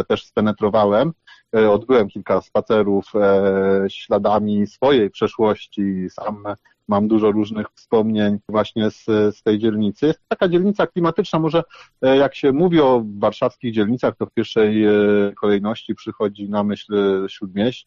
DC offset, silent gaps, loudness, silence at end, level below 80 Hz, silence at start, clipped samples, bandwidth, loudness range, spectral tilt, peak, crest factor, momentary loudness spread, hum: under 0.1%; none; -19 LUFS; 0.05 s; -54 dBFS; 0 s; under 0.1%; 7 kHz; 3 LU; -5.5 dB/octave; -6 dBFS; 12 dB; 8 LU; none